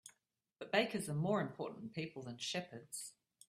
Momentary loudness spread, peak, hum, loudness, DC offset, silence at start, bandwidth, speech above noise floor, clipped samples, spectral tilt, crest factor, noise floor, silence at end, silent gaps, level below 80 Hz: 13 LU; -18 dBFS; none; -41 LUFS; under 0.1%; 0.05 s; 15 kHz; 40 dB; under 0.1%; -4.5 dB/octave; 22 dB; -80 dBFS; 0.4 s; none; -80 dBFS